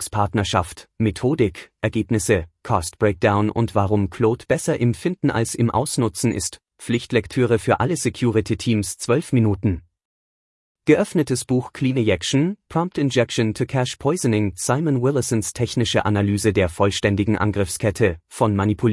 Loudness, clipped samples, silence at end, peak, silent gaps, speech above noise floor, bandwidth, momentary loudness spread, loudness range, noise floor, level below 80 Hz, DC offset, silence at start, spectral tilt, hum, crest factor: -21 LUFS; under 0.1%; 0 s; -4 dBFS; 10.05-10.75 s; over 70 dB; 12 kHz; 5 LU; 2 LU; under -90 dBFS; -48 dBFS; under 0.1%; 0 s; -5.5 dB/octave; none; 16 dB